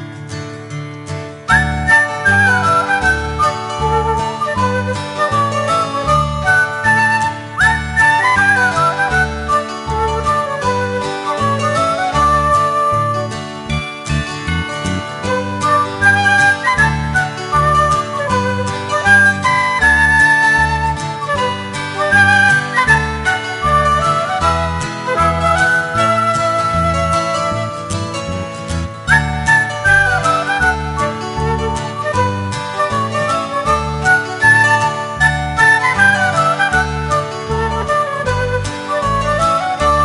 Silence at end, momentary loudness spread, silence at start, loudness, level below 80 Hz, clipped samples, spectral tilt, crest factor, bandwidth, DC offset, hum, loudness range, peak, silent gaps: 0 s; 10 LU; 0 s; -14 LUFS; -30 dBFS; under 0.1%; -4.5 dB/octave; 14 dB; 11.5 kHz; under 0.1%; none; 5 LU; 0 dBFS; none